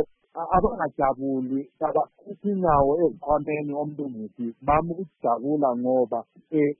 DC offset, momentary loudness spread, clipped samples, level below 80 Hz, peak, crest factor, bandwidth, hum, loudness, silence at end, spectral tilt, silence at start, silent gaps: under 0.1%; 11 LU; under 0.1%; -46 dBFS; -8 dBFS; 18 dB; 3.4 kHz; none; -25 LUFS; 0.05 s; -13 dB/octave; 0 s; none